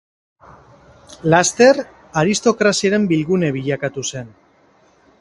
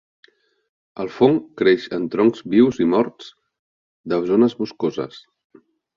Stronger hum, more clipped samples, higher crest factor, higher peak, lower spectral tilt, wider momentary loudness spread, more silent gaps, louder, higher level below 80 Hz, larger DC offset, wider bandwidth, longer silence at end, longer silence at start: neither; neither; about the same, 18 dB vs 18 dB; about the same, 0 dBFS vs -2 dBFS; second, -4.5 dB/octave vs -7.5 dB/octave; about the same, 12 LU vs 14 LU; second, none vs 3.59-4.04 s; about the same, -17 LUFS vs -19 LUFS; first, -54 dBFS vs -60 dBFS; neither; first, 11.5 kHz vs 7.2 kHz; first, 0.9 s vs 0.75 s; first, 1.25 s vs 0.95 s